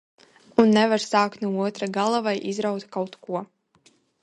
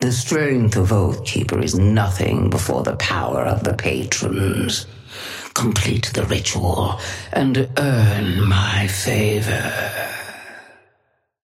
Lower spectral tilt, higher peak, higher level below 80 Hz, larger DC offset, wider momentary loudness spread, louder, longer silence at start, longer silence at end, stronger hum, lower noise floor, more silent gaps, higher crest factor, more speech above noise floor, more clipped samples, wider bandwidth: about the same, -5 dB/octave vs -5 dB/octave; about the same, -2 dBFS vs -4 dBFS; second, -70 dBFS vs -40 dBFS; neither; first, 13 LU vs 9 LU; second, -24 LUFS vs -19 LUFS; first, 0.6 s vs 0 s; about the same, 0.75 s vs 0.85 s; neither; second, -61 dBFS vs -66 dBFS; neither; first, 22 dB vs 16 dB; second, 38 dB vs 48 dB; neither; second, 10.5 kHz vs 15.5 kHz